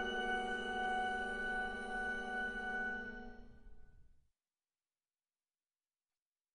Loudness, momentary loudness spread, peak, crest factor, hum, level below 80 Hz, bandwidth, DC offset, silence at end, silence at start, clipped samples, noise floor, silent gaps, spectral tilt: -40 LUFS; 10 LU; -26 dBFS; 16 dB; none; -60 dBFS; 10.5 kHz; under 0.1%; 2.45 s; 0 s; under 0.1%; under -90 dBFS; none; -3.5 dB/octave